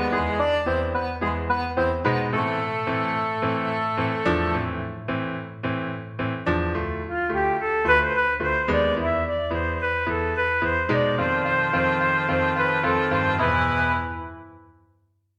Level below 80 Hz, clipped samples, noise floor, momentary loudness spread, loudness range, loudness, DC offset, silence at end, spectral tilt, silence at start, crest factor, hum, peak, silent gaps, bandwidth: -40 dBFS; under 0.1%; -65 dBFS; 8 LU; 4 LU; -23 LUFS; under 0.1%; 0.8 s; -7.5 dB/octave; 0 s; 18 dB; none; -6 dBFS; none; 9 kHz